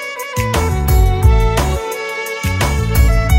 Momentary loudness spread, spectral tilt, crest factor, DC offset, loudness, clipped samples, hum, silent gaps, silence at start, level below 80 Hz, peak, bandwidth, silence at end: 8 LU; -5.5 dB/octave; 12 dB; under 0.1%; -16 LUFS; under 0.1%; none; none; 0 s; -16 dBFS; 0 dBFS; 16.5 kHz; 0 s